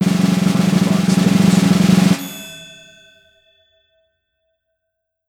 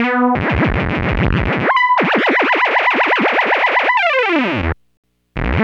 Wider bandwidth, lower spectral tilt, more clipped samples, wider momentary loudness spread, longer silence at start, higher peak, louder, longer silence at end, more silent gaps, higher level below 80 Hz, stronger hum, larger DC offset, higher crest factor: first, 16.5 kHz vs 8.4 kHz; about the same, -6 dB/octave vs -7 dB/octave; neither; first, 17 LU vs 7 LU; about the same, 0 s vs 0 s; about the same, -2 dBFS vs 0 dBFS; about the same, -14 LUFS vs -14 LUFS; first, 2.6 s vs 0 s; second, none vs 4.97-5.03 s; second, -50 dBFS vs -28 dBFS; neither; neither; about the same, 16 dB vs 16 dB